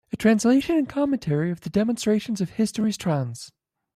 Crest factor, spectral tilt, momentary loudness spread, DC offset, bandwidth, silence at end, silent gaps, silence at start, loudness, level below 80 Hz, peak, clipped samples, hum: 16 dB; -6 dB/octave; 8 LU; under 0.1%; 14 kHz; 0.45 s; none; 0.15 s; -23 LUFS; -56 dBFS; -8 dBFS; under 0.1%; none